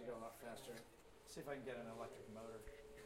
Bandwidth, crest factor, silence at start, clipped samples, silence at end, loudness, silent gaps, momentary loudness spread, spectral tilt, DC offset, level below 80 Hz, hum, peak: 16 kHz; 18 dB; 0 s; under 0.1%; 0 s; -54 LUFS; none; 9 LU; -4.5 dB/octave; under 0.1%; -70 dBFS; none; -34 dBFS